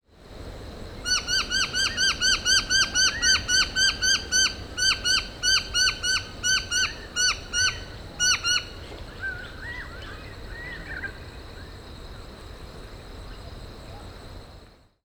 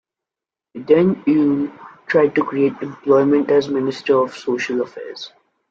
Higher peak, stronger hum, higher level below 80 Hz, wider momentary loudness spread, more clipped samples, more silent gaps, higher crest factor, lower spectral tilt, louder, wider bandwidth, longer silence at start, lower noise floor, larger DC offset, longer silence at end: second, -8 dBFS vs -2 dBFS; neither; first, -42 dBFS vs -62 dBFS; first, 23 LU vs 17 LU; neither; neither; about the same, 18 dB vs 16 dB; second, 0 dB/octave vs -7 dB/octave; second, -22 LUFS vs -18 LUFS; first, over 20 kHz vs 7.6 kHz; second, 0.2 s vs 0.75 s; second, -50 dBFS vs -88 dBFS; neither; about the same, 0.35 s vs 0.45 s